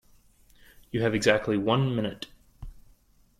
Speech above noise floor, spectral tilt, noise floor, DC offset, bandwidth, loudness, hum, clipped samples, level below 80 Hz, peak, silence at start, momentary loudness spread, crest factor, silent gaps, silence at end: 35 dB; -5.5 dB/octave; -60 dBFS; under 0.1%; 14.5 kHz; -26 LUFS; none; under 0.1%; -52 dBFS; -8 dBFS; 0.95 s; 14 LU; 22 dB; none; 0.6 s